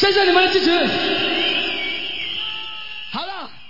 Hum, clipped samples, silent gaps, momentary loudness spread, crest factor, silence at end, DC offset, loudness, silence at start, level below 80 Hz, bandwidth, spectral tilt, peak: none; under 0.1%; none; 14 LU; 18 dB; 0 s; 2%; -18 LUFS; 0 s; -54 dBFS; 5.8 kHz; -4 dB/octave; -2 dBFS